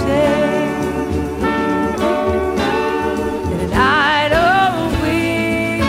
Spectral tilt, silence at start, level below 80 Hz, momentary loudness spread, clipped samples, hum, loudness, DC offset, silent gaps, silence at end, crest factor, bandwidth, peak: -5.5 dB/octave; 0 s; -34 dBFS; 7 LU; under 0.1%; none; -16 LUFS; under 0.1%; none; 0 s; 14 dB; 16 kHz; -2 dBFS